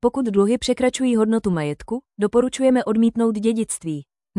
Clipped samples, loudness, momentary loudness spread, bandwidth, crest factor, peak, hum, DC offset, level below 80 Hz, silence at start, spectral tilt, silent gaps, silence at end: under 0.1%; -20 LUFS; 9 LU; 12 kHz; 14 dB; -6 dBFS; none; under 0.1%; -50 dBFS; 0.05 s; -5.5 dB/octave; none; 0.35 s